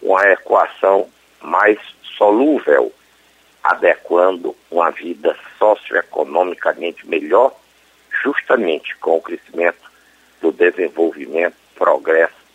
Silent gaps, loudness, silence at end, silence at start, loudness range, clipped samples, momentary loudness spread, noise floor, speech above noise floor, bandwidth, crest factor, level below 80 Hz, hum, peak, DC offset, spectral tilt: none; -16 LUFS; 0.25 s; 0 s; 3 LU; under 0.1%; 8 LU; -52 dBFS; 37 dB; 9.2 kHz; 16 dB; -68 dBFS; none; 0 dBFS; under 0.1%; -5 dB/octave